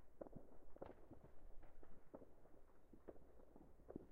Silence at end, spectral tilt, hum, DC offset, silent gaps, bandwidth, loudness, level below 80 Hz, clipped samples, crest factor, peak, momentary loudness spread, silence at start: 0 s; -6.5 dB/octave; none; under 0.1%; none; 3.7 kHz; -64 LUFS; -66 dBFS; under 0.1%; 18 dB; -38 dBFS; 9 LU; 0 s